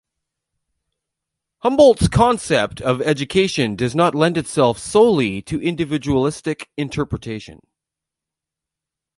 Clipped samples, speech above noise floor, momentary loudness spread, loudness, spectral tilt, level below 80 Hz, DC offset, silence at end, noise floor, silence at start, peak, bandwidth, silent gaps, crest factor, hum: under 0.1%; 68 dB; 13 LU; -18 LUFS; -5.5 dB/octave; -42 dBFS; under 0.1%; 1.65 s; -86 dBFS; 1.65 s; 0 dBFS; 11.5 kHz; none; 18 dB; none